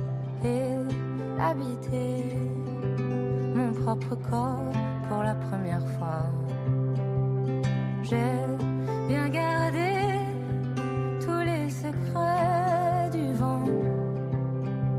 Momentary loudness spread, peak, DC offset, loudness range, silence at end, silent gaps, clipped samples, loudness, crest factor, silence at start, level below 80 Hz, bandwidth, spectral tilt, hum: 5 LU; -14 dBFS; under 0.1%; 2 LU; 0 s; none; under 0.1%; -28 LUFS; 14 dB; 0 s; -54 dBFS; 12 kHz; -8 dB/octave; none